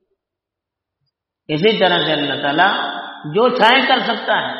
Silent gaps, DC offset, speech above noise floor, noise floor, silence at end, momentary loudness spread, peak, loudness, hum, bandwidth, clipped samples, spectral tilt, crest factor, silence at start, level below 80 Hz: none; under 0.1%; 68 dB; -83 dBFS; 0 s; 11 LU; 0 dBFS; -15 LUFS; none; 6 kHz; under 0.1%; -1.5 dB/octave; 18 dB; 1.5 s; -64 dBFS